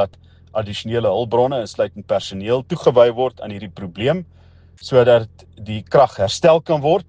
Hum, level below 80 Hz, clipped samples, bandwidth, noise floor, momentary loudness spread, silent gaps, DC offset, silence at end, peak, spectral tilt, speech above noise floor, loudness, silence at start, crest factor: none; -54 dBFS; under 0.1%; 9.6 kHz; -38 dBFS; 17 LU; none; under 0.1%; 0.05 s; 0 dBFS; -6 dB/octave; 20 dB; -18 LUFS; 0 s; 18 dB